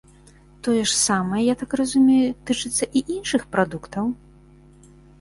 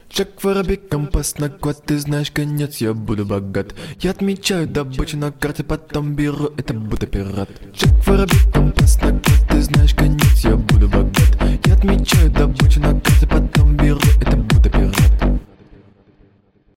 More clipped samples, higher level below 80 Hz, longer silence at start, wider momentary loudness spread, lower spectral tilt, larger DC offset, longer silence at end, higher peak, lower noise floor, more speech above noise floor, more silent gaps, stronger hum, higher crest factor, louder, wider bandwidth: neither; second, -52 dBFS vs -18 dBFS; first, 0.65 s vs 0.15 s; about the same, 10 LU vs 10 LU; second, -3.5 dB/octave vs -6 dB/octave; neither; second, 1.05 s vs 1.3 s; second, -4 dBFS vs 0 dBFS; second, -50 dBFS vs -55 dBFS; second, 29 dB vs 40 dB; neither; neither; about the same, 18 dB vs 14 dB; second, -21 LUFS vs -17 LUFS; second, 11.5 kHz vs 16.5 kHz